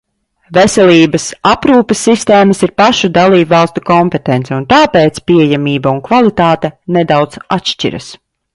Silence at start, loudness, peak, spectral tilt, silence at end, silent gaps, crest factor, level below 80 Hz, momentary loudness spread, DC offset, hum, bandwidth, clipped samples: 0.5 s; -10 LUFS; 0 dBFS; -5 dB/octave; 0.4 s; none; 10 dB; -42 dBFS; 8 LU; under 0.1%; none; 11.5 kHz; under 0.1%